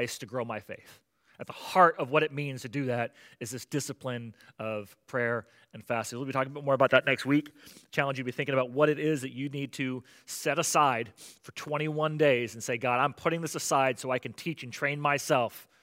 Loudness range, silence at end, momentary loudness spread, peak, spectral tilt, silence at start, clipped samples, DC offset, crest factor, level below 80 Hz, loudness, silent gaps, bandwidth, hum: 6 LU; 0.2 s; 15 LU; -6 dBFS; -4.5 dB/octave; 0 s; under 0.1%; under 0.1%; 24 dB; -78 dBFS; -29 LUFS; none; 16 kHz; none